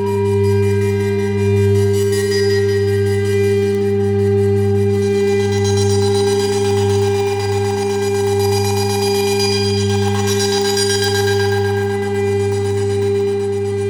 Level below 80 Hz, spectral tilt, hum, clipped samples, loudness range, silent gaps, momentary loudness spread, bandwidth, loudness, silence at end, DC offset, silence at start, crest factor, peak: -52 dBFS; -5.5 dB/octave; none; under 0.1%; 1 LU; none; 3 LU; 19.5 kHz; -16 LUFS; 0 s; under 0.1%; 0 s; 12 dB; -4 dBFS